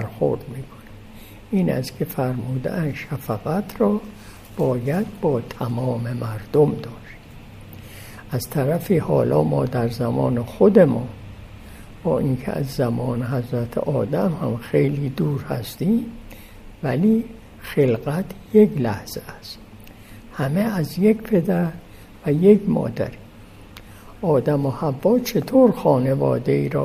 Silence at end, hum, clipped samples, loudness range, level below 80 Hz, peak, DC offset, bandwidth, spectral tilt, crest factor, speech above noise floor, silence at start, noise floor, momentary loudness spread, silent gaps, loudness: 0 s; none; under 0.1%; 5 LU; -46 dBFS; -2 dBFS; under 0.1%; 15.5 kHz; -8 dB/octave; 20 dB; 23 dB; 0 s; -43 dBFS; 22 LU; none; -21 LUFS